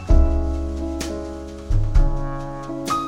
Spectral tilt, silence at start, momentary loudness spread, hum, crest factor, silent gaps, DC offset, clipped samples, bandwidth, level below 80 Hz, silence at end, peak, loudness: -6.5 dB/octave; 0 s; 11 LU; none; 16 dB; none; under 0.1%; under 0.1%; 11.5 kHz; -20 dBFS; 0 s; -4 dBFS; -25 LUFS